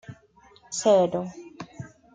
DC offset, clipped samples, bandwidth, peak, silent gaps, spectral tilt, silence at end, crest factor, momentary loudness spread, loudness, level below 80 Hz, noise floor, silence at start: under 0.1%; under 0.1%; 9.6 kHz; -8 dBFS; none; -4.5 dB/octave; 0.25 s; 18 dB; 22 LU; -23 LUFS; -66 dBFS; -56 dBFS; 0.1 s